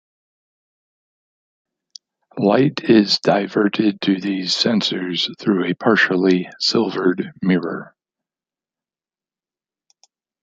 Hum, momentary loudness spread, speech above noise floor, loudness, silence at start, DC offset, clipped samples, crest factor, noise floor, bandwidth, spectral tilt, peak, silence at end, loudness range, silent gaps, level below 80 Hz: none; 6 LU; over 72 dB; -18 LUFS; 2.35 s; under 0.1%; under 0.1%; 18 dB; under -90 dBFS; 9 kHz; -5 dB/octave; -2 dBFS; 2.6 s; 6 LU; none; -64 dBFS